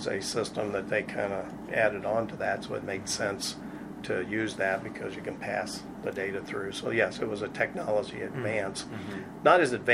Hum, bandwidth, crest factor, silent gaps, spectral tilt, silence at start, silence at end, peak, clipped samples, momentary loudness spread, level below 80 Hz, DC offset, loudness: none; 15 kHz; 24 dB; none; -4 dB/octave; 0 s; 0 s; -6 dBFS; under 0.1%; 9 LU; -60 dBFS; under 0.1%; -31 LUFS